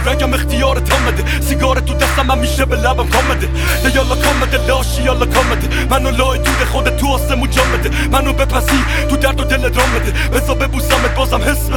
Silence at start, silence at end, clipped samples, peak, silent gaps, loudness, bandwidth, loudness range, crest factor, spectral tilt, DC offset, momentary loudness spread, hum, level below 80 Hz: 0 s; 0 s; under 0.1%; 0 dBFS; none; -14 LUFS; 18.5 kHz; 0 LU; 14 dB; -4.5 dB/octave; under 0.1%; 2 LU; none; -16 dBFS